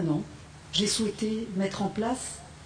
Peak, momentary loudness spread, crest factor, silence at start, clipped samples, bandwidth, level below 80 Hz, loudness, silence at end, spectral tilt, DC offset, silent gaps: -14 dBFS; 11 LU; 18 dB; 0 s; under 0.1%; 10.5 kHz; -54 dBFS; -29 LUFS; 0 s; -4 dB/octave; under 0.1%; none